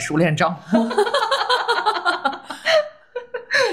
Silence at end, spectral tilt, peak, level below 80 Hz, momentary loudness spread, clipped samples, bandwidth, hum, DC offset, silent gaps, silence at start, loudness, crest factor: 0 s; -4.5 dB/octave; -6 dBFS; -64 dBFS; 11 LU; under 0.1%; 15.5 kHz; none; 0.1%; none; 0 s; -19 LUFS; 14 dB